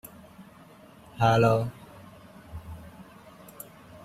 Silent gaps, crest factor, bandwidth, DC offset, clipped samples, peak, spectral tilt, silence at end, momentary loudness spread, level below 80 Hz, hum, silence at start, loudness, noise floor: none; 22 dB; 15.5 kHz; under 0.1%; under 0.1%; -8 dBFS; -6.5 dB/octave; 0.1 s; 28 LU; -56 dBFS; none; 0.4 s; -24 LUFS; -52 dBFS